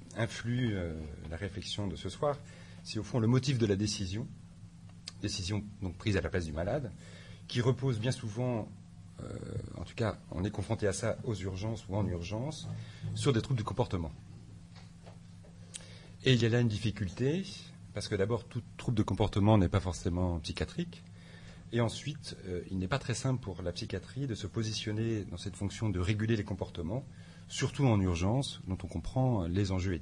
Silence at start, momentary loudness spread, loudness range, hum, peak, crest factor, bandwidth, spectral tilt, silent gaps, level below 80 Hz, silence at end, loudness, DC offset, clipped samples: 0 s; 20 LU; 5 LU; none; -14 dBFS; 20 dB; 11 kHz; -6 dB/octave; none; -54 dBFS; 0 s; -34 LUFS; under 0.1%; under 0.1%